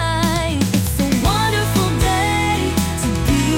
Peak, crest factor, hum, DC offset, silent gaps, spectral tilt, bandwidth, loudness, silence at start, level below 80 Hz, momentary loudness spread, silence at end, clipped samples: -6 dBFS; 12 dB; none; under 0.1%; none; -4.5 dB/octave; 17 kHz; -17 LUFS; 0 s; -28 dBFS; 3 LU; 0 s; under 0.1%